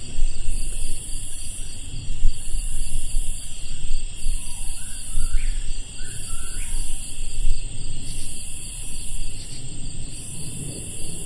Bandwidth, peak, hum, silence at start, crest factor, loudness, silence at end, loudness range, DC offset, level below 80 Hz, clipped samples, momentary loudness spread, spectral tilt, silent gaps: 11.5 kHz; -2 dBFS; none; 0 s; 16 dB; -31 LUFS; 0 s; 2 LU; under 0.1%; -24 dBFS; under 0.1%; 5 LU; -2.5 dB/octave; none